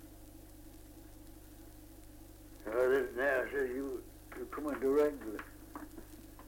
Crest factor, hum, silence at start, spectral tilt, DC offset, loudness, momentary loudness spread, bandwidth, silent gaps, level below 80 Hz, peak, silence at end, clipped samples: 18 dB; 50 Hz at -60 dBFS; 0 s; -5.5 dB/octave; under 0.1%; -35 LUFS; 24 LU; 17 kHz; none; -56 dBFS; -20 dBFS; 0 s; under 0.1%